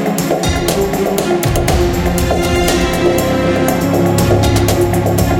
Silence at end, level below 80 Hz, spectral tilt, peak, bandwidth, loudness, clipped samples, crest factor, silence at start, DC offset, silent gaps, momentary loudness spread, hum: 0 s; -24 dBFS; -5.5 dB/octave; 0 dBFS; 17.5 kHz; -13 LUFS; under 0.1%; 12 dB; 0 s; under 0.1%; none; 3 LU; none